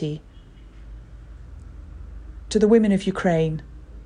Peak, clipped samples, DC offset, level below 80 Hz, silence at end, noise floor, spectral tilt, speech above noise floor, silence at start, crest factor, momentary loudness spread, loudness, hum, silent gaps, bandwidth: -6 dBFS; under 0.1%; under 0.1%; -40 dBFS; 0 s; -44 dBFS; -7 dB/octave; 25 dB; 0 s; 18 dB; 27 LU; -21 LUFS; none; none; 10.5 kHz